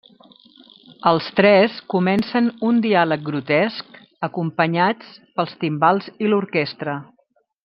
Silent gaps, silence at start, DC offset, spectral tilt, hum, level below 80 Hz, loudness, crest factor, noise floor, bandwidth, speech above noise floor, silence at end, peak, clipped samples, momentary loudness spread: none; 1.05 s; under 0.1%; -8.5 dB/octave; none; -66 dBFS; -19 LUFS; 18 dB; -64 dBFS; 5.8 kHz; 45 dB; 0.6 s; -2 dBFS; under 0.1%; 12 LU